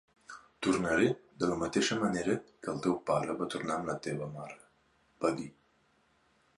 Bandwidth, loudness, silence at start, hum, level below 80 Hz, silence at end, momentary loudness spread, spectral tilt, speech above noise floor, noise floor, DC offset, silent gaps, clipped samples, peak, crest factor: 11.5 kHz; -33 LUFS; 0.3 s; none; -64 dBFS; 1.1 s; 18 LU; -5 dB/octave; 38 dB; -70 dBFS; under 0.1%; none; under 0.1%; -14 dBFS; 20 dB